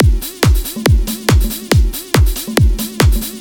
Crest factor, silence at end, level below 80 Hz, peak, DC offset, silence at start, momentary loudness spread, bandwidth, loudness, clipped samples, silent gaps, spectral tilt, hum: 12 dB; 0 s; -16 dBFS; 0 dBFS; under 0.1%; 0 s; 1 LU; 19 kHz; -15 LUFS; under 0.1%; none; -5 dB/octave; none